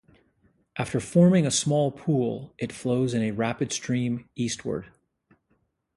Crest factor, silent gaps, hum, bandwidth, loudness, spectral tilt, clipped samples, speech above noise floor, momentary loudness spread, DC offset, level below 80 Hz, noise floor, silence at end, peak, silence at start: 18 dB; none; none; 11.5 kHz; -26 LUFS; -5.5 dB/octave; under 0.1%; 46 dB; 14 LU; under 0.1%; -60 dBFS; -71 dBFS; 1.1 s; -8 dBFS; 0.75 s